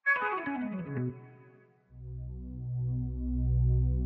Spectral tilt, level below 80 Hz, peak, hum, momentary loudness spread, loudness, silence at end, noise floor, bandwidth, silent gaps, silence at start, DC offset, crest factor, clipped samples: -7.5 dB/octave; -36 dBFS; -18 dBFS; none; 15 LU; -33 LUFS; 0 s; -60 dBFS; 4 kHz; none; 0.05 s; under 0.1%; 14 dB; under 0.1%